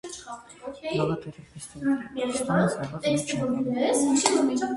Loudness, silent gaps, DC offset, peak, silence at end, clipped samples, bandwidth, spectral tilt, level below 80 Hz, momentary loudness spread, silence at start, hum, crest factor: -26 LUFS; none; under 0.1%; -4 dBFS; 0 s; under 0.1%; 11.5 kHz; -4.5 dB/octave; -60 dBFS; 19 LU; 0.05 s; none; 22 dB